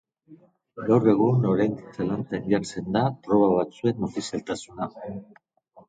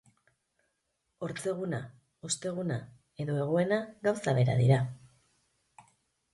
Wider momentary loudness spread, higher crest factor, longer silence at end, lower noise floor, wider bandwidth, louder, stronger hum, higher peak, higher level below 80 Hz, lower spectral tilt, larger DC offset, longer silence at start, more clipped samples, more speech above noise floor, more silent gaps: about the same, 14 LU vs 14 LU; about the same, 18 dB vs 20 dB; second, 0.1 s vs 1.25 s; second, -53 dBFS vs -80 dBFS; second, 9.4 kHz vs 11.5 kHz; first, -25 LUFS vs -31 LUFS; neither; first, -6 dBFS vs -12 dBFS; first, -58 dBFS vs -64 dBFS; first, -7.5 dB/octave vs -6 dB/octave; neither; second, 0.3 s vs 1.2 s; neither; second, 29 dB vs 51 dB; neither